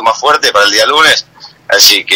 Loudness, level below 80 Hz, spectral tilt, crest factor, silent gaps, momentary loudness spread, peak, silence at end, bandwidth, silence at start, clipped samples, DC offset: -7 LUFS; -48 dBFS; 0.5 dB/octave; 8 dB; none; 7 LU; 0 dBFS; 0 s; over 20 kHz; 0 s; 2%; under 0.1%